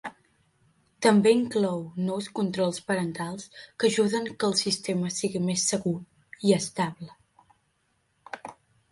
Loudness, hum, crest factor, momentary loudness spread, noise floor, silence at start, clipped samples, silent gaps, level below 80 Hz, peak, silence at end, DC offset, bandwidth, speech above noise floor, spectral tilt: -26 LUFS; none; 20 dB; 19 LU; -72 dBFS; 0.05 s; under 0.1%; none; -68 dBFS; -8 dBFS; 0.4 s; under 0.1%; 11.5 kHz; 46 dB; -4.5 dB/octave